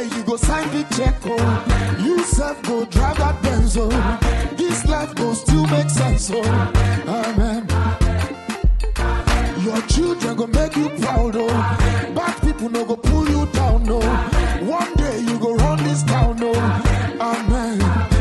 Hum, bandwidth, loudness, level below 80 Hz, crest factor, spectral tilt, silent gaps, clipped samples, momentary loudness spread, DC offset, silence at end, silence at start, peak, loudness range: none; 12.5 kHz; -19 LUFS; -22 dBFS; 16 dB; -5.5 dB/octave; none; under 0.1%; 4 LU; under 0.1%; 0 s; 0 s; -2 dBFS; 1 LU